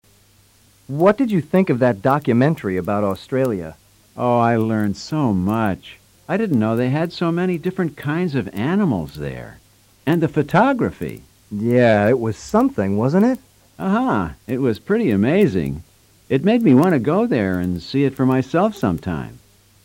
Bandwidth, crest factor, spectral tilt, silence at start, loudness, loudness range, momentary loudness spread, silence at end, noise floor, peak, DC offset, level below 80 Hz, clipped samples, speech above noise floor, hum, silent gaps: 16.5 kHz; 16 dB; -8 dB/octave; 0.9 s; -19 LUFS; 3 LU; 12 LU; 0.45 s; -54 dBFS; -4 dBFS; under 0.1%; -48 dBFS; under 0.1%; 36 dB; none; none